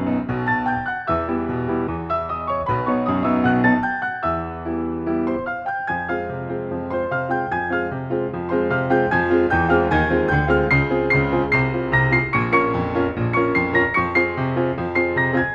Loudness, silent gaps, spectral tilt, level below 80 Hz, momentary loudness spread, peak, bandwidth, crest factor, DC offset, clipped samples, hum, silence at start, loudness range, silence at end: -20 LUFS; none; -9 dB/octave; -40 dBFS; 7 LU; -4 dBFS; 7 kHz; 16 dB; under 0.1%; under 0.1%; none; 0 s; 6 LU; 0 s